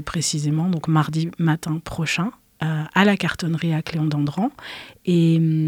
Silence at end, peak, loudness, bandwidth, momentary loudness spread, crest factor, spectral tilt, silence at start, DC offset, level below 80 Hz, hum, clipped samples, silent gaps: 0 s; -2 dBFS; -22 LUFS; 14 kHz; 9 LU; 20 dB; -5.5 dB/octave; 0 s; under 0.1%; -52 dBFS; none; under 0.1%; none